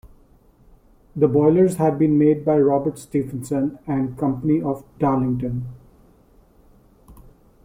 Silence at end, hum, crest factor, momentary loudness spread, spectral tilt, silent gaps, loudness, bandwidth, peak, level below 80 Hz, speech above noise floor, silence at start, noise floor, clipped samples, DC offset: 0.5 s; none; 18 dB; 10 LU; -9 dB/octave; none; -20 LUFS; 15.5 kHz; -4 dBFS; -48 dBFS; 34 dB; 0.05 s; -53 dBFS; under 0.1%; under 0.1%